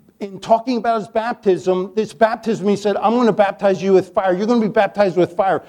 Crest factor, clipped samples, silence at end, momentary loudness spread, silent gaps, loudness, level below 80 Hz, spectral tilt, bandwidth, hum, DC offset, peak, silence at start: 16 dB; under 0.1%; 0.05 s; 5 LU; none; -17 LUFS; -58 dBFS; -6.5 dB/octave; 11 kHz; none; under 0.1%; -2 dBFS; 0.2 s